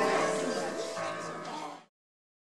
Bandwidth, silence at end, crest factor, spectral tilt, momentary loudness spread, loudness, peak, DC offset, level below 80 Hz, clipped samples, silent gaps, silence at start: 14 kHz; 0.7 s; 18 dB; -3.5 dB/octave; 13 LU; -34 LUFS; -16 dBFS; under 0.1%; -78 dBFS; under 0.1%; none; 0 s